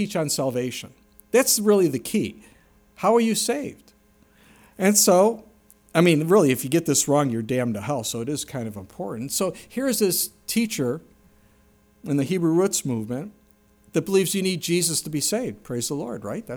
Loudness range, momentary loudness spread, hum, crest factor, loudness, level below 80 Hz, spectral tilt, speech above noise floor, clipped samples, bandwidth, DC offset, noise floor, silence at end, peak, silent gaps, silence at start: 6 LU; 14 LU; none; 20 dB; -22 LUFS; -62 dBFS; -4 dB/octave; 36 dB; under 0.1%; over 20 kHz; under 0.1%; -58 dBFS; 0 s; -4 dBFS; none; 0 s